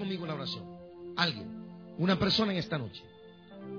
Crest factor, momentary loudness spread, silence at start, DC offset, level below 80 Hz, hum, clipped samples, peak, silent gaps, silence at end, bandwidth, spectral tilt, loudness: 22 dB; 21 LU; 0 s; under 0.1%; -60 dBFS; none; under 0.1%; -12 dBFS; none; 0 s; 5.4 kHz; -6 dB/octave; -31 LUFS